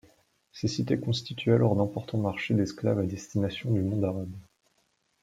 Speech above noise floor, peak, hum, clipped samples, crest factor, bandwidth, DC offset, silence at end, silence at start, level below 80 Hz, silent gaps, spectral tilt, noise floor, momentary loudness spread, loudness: 45 dB; -10 dBFS; none; under 0.1%; 20 dB; 9.2 kHz; under 0.1%; 0.8 s; 0.55 s; -62 dBFS; none; -7 dB/octave; -72 dBFS; 8 LU; -29 LUFS